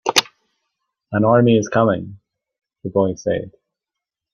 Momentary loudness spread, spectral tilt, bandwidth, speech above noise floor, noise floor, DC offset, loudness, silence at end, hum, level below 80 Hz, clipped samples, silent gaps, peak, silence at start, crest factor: 16 LU; -5 dB/octave; 15.5 kHz; 68 dB; -85 dBFS; under 0.1%; -18 LUFS; 0.85 s; none; -56 dBFS; under 0.1%; none; 0 dBFS; 0.05 s; 20 dB